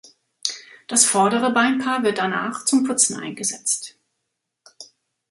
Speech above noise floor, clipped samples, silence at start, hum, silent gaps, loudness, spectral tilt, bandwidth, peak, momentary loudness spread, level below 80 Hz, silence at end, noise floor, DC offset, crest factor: 58 dB; under 0.1%; 0.45 s; none; none; -20 LUFS; -2 dB/octave; 12 kHz; -2 dBFS; 12 LU; -70 dBFS; 0.45 s; -78 dBFS; under 0.1%; 22 dB